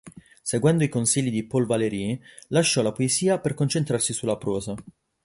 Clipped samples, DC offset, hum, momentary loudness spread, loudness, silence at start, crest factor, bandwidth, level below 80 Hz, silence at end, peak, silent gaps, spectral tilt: under 0.1%; under 0.1%; none; 9 LU; -24 LUFS; 0.05 s; 18 dB; 11.5 kHz; -56 dBFS; 0.35 s; -8 dBFS; none; -4.5 dB/octave